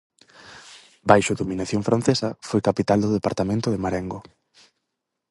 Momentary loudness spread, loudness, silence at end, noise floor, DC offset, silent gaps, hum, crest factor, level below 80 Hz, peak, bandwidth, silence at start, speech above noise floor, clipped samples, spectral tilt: 17 LU; -22 LUFS; 1.1 s; -80 dBFS; under 0.1%; none; none; 24 dB; -50 dBFS; 0 dBFS; 11.5 kHz; 0.45 s; 59 dB; under 0.1%; -6 dB/octave